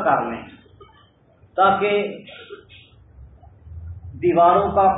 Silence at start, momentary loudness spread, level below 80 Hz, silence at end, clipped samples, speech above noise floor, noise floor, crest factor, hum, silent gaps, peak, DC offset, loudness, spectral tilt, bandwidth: 0 s; 24 LU; -46 dBFS; 0 s; under 0.1%; 36 dB; -54 dBFS; 16 dB; none; none; -4 dBFS; under 0.1%; -19 LUFS; -10.5 dB/octave; 4 kHz